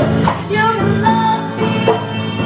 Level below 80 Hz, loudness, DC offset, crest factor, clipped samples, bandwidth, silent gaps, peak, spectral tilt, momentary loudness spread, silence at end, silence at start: -38 dBFS; -15 LUFS; under 0.1%; 14 dB; under 0.1%; 4 kHz; none; 0 dBFS; -10.5 dB/octave; 4 LU; 0 s; 0 s